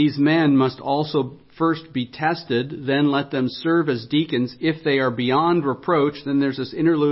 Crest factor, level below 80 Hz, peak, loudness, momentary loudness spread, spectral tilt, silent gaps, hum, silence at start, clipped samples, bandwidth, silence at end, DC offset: 14 dB; -62 dBFS; -6 dBFS; -21 LUFS; 6 LU; -11 dB/octave; none; none; 0 s; under 0.1%; 5.8 kHz; 0 s; under 0.1%